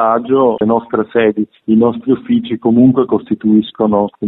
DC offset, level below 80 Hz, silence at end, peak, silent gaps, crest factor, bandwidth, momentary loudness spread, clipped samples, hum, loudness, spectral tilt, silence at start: under 0.1%; -52 dBFS; 0 s; 0 dBFS; none; 12 dB; 4.1 kHz; 6 LU; under 0.1%; none; -13 LUFS; -11.5 dB/octave; 0 s